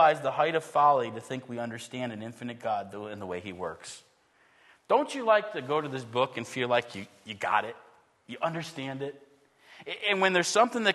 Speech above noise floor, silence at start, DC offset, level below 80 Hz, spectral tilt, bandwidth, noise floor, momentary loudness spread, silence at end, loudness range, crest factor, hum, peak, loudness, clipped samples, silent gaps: 36 dB; 0 s; under 0.1%; -76 dBFS; -4 dB/octave; 12.5 kHz; -65 dBFS; 16 LU; 0 s; 8 LU; 22 dB; none; -8 dBFS; -29 LUFS; under 0.1%; none